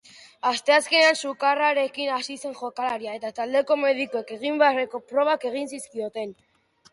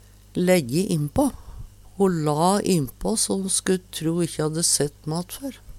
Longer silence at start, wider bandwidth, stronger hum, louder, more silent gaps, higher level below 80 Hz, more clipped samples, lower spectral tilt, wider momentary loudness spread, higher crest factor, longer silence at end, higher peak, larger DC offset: second, 0.2 s vs 0.35 s; second, 11.5 kHz vs 16.5 kHz; neither; about the same, -24 LUFS vs -23 LUFS; neither; second, -76 dBFS vs -46 dBFS; neither; second, -1.5 dB/octave vs -4.5 dB/octave; first, 14 LU vs 9 LU; about the same, 18 dB vs 18 dB; first, 0.6 s vs 0 s; about the same, -6 dBFS vs -6 dBFS; neither